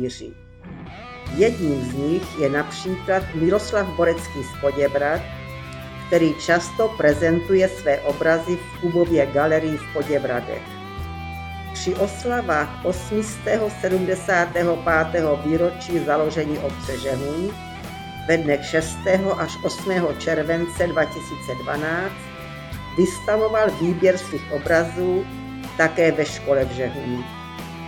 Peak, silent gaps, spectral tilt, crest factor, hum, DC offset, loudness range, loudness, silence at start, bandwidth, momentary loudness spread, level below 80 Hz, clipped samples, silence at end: -4 dBFS; none; -5.5 dB/octave; 18 dB; none; under 0.1%; 4 LU; -22 LUFS; 0 s; 18 kHz; 14 LU; -42 dBFS; under 0.1%; 0 s